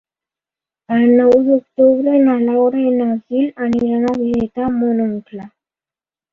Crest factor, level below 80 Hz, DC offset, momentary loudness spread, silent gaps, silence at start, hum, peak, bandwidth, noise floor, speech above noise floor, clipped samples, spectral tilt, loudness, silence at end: 14 dB; -52 dBFS; under 0.1%; 8 LU; none; 0.9 s; none; -2 dBFS; 5.2 kHz; under -90 dBFS; over 76 dB; under 0.1%; -8.5 dB/octave; -15 LUFS; 0.85 s